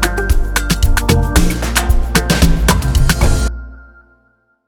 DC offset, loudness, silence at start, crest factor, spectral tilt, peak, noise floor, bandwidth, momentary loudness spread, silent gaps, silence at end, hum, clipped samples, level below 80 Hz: under 0.1%; -15 LUFS; 0 s; 14 dB; -4.5 dB/octave; 0 dBFS; -57 dBFS; 19 kHz; 5 LU; none; 0.85 s; none; under 0.1%; -16 dBFS